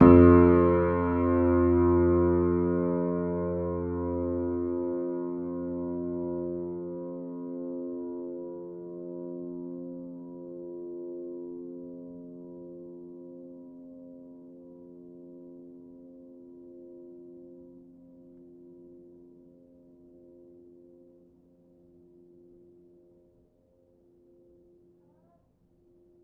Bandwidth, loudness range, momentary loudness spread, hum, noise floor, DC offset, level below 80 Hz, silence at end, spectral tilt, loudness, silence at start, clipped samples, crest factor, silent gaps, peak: 3.4 kHz; 25 LU; 26 LU; none; -66 dBFS; under 0.1%; -48 dBFS; 7.5 s; -10.5 dB/octave; -27 LUFS; 0 s; under 0.1%; 26 dB; none; -4 dBFS